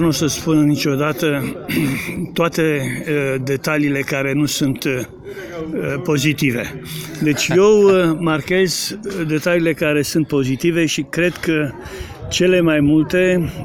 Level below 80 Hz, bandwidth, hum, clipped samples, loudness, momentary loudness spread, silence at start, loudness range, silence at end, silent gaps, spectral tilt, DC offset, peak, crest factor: -44 dBFS; 17 kHz; none; under 0.1%; -17 LUFS; 10 LU; 0 s; 4 LU; 0 s; none; -5 dB/octave; under 0.1%; -2 dBFS; 14 dB